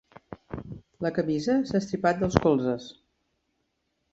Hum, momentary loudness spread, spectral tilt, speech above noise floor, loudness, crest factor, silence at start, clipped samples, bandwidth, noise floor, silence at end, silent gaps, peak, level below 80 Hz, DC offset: none; 21 LU; -7 dB/octave; 51 dB; -26 LUFS; 26 dB; 0.3 s; under 0.1%; 8 kHz; -76 dBFS; 1.2 s; none; -2 dBFS; -50 dBFS; under 0.1%